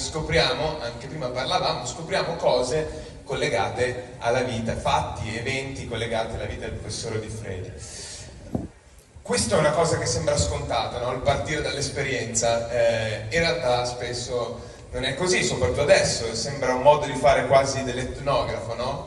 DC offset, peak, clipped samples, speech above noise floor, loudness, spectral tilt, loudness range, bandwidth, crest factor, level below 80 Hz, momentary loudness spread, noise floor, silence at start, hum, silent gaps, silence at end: under 0.1%; -2 dBFS; under 0.1%; 25 dB; -24 LUFS; -4 dB/octave; 8 LU; 11.5 kHz; 22 dB; -42 dBFS; 13 LU; -49 dBFS; 0 s; none; none; 0 s